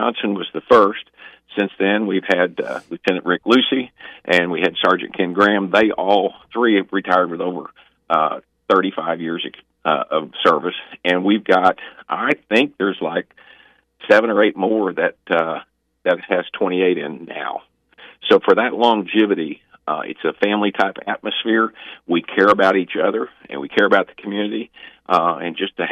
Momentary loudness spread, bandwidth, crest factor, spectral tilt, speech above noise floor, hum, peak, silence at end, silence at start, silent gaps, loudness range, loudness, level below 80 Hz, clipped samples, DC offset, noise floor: 12 LU; 10 kHz; 18 dB; -6 dB/octave; 33 dB; none; -2 dBFS; 0 s; 0 s; none; 3 LU; -18 LUFS; -64 dBFS; under 0.1%; under 0.1%; -51 dBFS